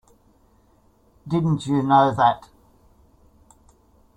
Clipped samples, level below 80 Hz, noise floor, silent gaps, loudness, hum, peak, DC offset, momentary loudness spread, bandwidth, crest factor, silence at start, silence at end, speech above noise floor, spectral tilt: under 0.1%; -54 dBFS; -58 dBFS; none; -20 LUFS; none; -4 dBFS; under 0.1%; 9 LU; 10.5 kHz; 20 dB; 1.25 s; 1.8 s; 39 dB; -7.5 dB/octave